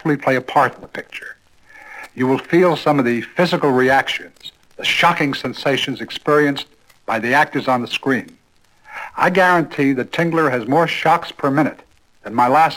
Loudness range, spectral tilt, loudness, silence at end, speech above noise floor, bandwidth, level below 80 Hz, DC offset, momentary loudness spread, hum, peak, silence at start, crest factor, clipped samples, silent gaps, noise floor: 2 LU; -5.5 dB/octave; -17 LUFS; 0 s; 35 dB; 17 kHz; -58 dBFS; under 0.1%; 18 LU; none; -2 dBFS; 0.05 s; 16 dB; under 0.1%; none; -51 dBFS